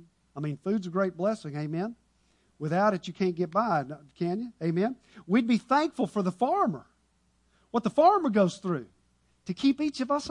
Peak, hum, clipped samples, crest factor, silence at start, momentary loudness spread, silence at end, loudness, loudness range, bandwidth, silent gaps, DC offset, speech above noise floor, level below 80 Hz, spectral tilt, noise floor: -10 dBFS; none; under 0.1%; 18 dB; 0.35 s; 12 LU; 0 s; -28 LUFS; 3 LU; 11 kHz; none; under 0.1%; 42 dB; -68 dBFS; -7 dB/octave; -69 dBFS